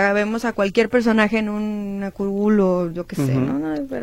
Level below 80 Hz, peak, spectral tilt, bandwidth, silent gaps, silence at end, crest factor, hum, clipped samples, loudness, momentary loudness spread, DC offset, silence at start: -46 dBFS; -4 dBFS; -7 dB/octave; 14.5 kHz; none; 0 s; 16 dB; none; under 0.1%; -20 LUFS; 8 LU; under 0.1%; 0 s